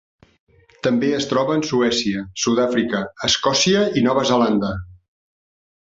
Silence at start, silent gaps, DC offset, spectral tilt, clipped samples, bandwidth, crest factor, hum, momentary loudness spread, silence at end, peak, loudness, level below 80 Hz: 0.85 s; none; under 0.1%; -4 dB/octave; under 0.1%; 7.8 kHz; 16 dB; none; 7 LU; 1 s; -4 dBFS; -19 LUFS; -50 dBFS